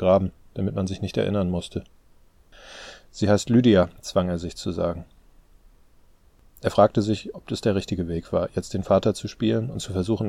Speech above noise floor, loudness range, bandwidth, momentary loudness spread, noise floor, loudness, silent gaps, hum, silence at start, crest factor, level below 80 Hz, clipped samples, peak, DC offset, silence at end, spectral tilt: 32 dB; 3 LU; 14.5 kHz; 13 LU; -55 dBFS; -24 LUFS; none; none; 0 s; 22 dB; -48 dBFS; under 0.1%; -4 dBFS; under 0.1%; 0 s; -6.5 dB/octave